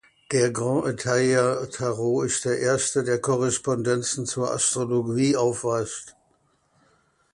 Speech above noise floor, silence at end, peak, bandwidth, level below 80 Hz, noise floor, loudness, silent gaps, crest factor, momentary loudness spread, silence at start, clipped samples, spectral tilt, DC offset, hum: 42 dB; 1.25 s; -8 dBFS; 11.5 kHz; -60 dBFS; -66 dBFS; -24 LUFS; none; 16 dB; 5 LU; 0.3 s; under 0.1%; -4.5 dB/octave; under 0.1%; none